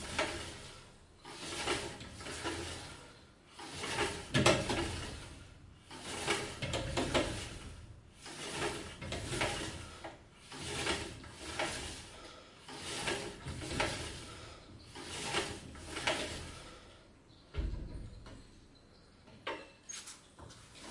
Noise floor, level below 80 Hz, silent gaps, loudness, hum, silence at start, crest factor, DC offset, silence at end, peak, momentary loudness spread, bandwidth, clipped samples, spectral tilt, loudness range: -61 dBFS; -54 dBFS; none; -38 LUFS; none; 0 s; 30 dB; under 0.1%; 0 s; -10 dBFS; 19 LU; 11.5 kHz; under 0.1%; -3.5 dB/octave; 10 LU